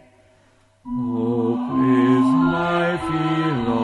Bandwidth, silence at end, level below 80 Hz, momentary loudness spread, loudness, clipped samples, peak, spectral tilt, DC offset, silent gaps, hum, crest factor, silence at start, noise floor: 10 kHz; 0 s; -50 dBFS; 7 LU; -20 LUFS; under 0.1%; -6 dBFS; -8 dB/octave; under 0.1%; none; none; 14 dB; 0.85 s; -57 dBFS